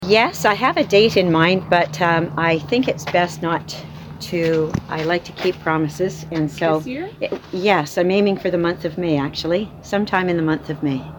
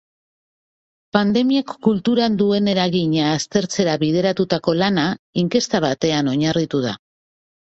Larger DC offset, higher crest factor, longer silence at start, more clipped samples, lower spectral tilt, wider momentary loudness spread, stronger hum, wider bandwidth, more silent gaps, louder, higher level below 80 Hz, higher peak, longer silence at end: neither; about the same, 16 dB vs 16 dB; second, 0 s vs 1.15 s; neither; about the same, -5.5 dB/octave vs -5.5 dB/octave; first, 9 LU vs 5 LU; neither; first, 19 kHz vs 8.2 kHz; second, none vs 5.19-5.33 s; about the same, -19 LUFS vs -19 LUFS; first, -48 dBFS vs -56 dBFS; about the same, -2 dBFS vs -2 dBFS; second, 0 s vs 0.8 s